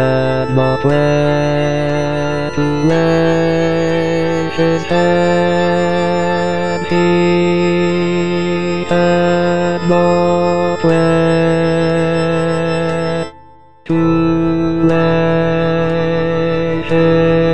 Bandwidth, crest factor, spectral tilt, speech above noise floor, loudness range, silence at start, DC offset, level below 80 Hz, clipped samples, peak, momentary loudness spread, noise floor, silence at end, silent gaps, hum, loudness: 9.4 kHz; 12 dB; -7 dB/octave; 30 dB; 2 LU; 0 s; 4%; -40 dBFS; under 0.1%; -2 dBFS; 4 LU; -43 dBFS; 0 s; none; none; -14 LUFS